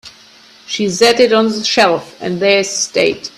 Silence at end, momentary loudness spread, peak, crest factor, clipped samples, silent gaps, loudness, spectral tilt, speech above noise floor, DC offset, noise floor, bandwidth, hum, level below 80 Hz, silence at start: 0.1 s; 9 LU; 0 dBFS; 14 dB; under 0.1%; none; -13 LUFS; -3 dB/octave; 30 dB; under 0.1%; -43 dBFS; 14 kHz; none; -58 dBFS; 0.05 s